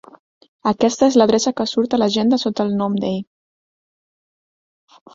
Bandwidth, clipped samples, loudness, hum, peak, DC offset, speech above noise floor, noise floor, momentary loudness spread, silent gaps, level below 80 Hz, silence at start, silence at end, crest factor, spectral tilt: 7.8 kHz; under 0.1%; -18 LUFS; none; 0 dBFS; under 0.1%; over 73 dB; under -90 dBFS; 9 LU; none; -58 dBFS; 0.65 s; 1.9 s; 18 dB; -5 dB/octave